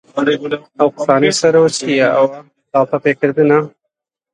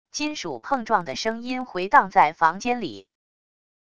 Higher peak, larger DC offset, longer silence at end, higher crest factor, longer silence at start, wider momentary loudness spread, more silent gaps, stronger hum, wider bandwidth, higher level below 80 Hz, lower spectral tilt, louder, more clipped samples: about the same, 0 dBFS vs -2 dBFS; second, under 0.1% vs 0.5%; second, 0.65 s vs 0.8 s; second, 14 dB vs 22 dB; about the same, 0.15 s vs 0.15 s; second, 7 LU vs 12 LU; neither; neither; about the same, 11 kHz vs 10 kHz; about the same, -60 dBFS vs -60 dBFS; about the same, -4.5 dB/octave vs -3.5 dB/octave; first, -14 LUFS vs -23 LUFS; neither